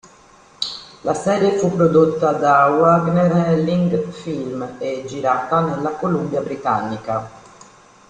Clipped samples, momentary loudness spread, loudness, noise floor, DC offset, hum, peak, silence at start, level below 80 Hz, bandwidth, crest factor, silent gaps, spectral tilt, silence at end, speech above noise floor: under 0.1%; 12 LU; -18 LUFS; -48 dBFS; under 0.1%; none; -2 dBFS; 0.6 s; -54 dBFS; 9.6 kHz; 16 dB; none; -7 dB/octave; 0.7 s; 31 dB